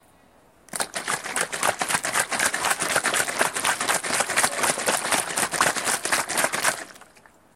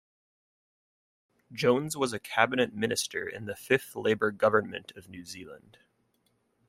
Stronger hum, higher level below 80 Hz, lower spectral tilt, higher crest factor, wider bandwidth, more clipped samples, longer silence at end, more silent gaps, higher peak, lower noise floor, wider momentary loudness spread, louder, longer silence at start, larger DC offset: neither; first, -62 dBFS vs -70 dBFS; second, -0.5 dB/octave vs -4 dB/octave; about the same, 22 dB vs 26 dB; about the same, 16.5 kHz vs 16 kHz; neither; second, 0.5 s vs 1.1 s; neither; about the same, -4 dBFS vs -6 dBFS; second, -56 dBFS vs -73 dBFS; second, 6 LU vs 18 LU; first, -23 LUFS vs -28 LUFS; second, 0.75 s vs 1.5 s; neither